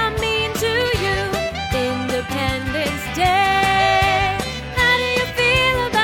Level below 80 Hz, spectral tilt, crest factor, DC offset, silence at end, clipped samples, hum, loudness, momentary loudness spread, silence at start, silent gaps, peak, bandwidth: -34 dBFS; -4 dB/octave; 16 dB; under 0.1%; 0 s; under 0.1%; none; -18 LUFS; 7 LU; 0 s; none; -4 dBFS; 17.5 kHz